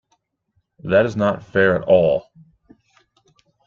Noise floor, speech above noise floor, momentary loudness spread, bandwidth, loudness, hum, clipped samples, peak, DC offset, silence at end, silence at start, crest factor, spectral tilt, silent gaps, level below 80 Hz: -69 dBFS; 52 dB; 7 LU; 7 kHz; -18 LUFS; none; under 0.1%; -2 dBFS; under 0.1%; 1.45 s; 0.85 s; 18 dB; -7.5 dB/octave; none; -54 dBFS